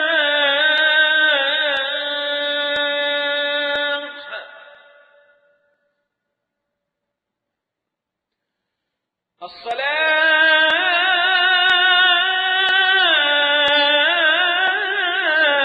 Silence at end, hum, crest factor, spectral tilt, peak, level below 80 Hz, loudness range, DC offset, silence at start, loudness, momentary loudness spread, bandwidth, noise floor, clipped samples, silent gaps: 0 s; none; 14 dB; -1.5 dB/octave; -4 dBFS; -68 dBFS; 12 LU; under 0.1%; 0 s; -15 LUFS; 8 LU; 8.4 kHz; -82 dBFS; under 0.1%; none